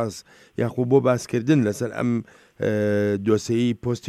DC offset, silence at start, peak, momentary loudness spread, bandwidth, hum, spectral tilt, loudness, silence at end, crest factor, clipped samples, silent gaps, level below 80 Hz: under 0.1%; 0 s; -6 dBFS; 9 LU; 15 kHz; none; -7 dB/octave; -23 LUFS; 0 s; 18 dB; under 0.1%; none; -60 dBFS